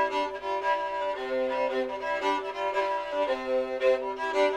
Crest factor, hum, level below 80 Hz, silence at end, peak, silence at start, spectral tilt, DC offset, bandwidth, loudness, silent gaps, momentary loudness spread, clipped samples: 16 dB; 50 Hz at -65 dBFS; -62 dBFS; 0 s; -12 dBFS; 0 s; -3 dB/octave; under 0.1%; 11 kHz; -29 LUFS; none; 4 LU; under 0.1%